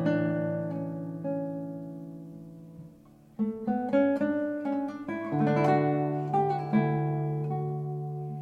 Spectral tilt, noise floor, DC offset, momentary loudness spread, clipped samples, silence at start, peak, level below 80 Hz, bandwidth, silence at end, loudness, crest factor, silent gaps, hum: -9.5 dB/octave; -54 dBFS; under 0.1%; 18 LU; under 0.1%; 0 s; -14 dBFS; -66 dBFS; 6.6 kHz; 0 s; -29 LUFS; 16 dB; none; none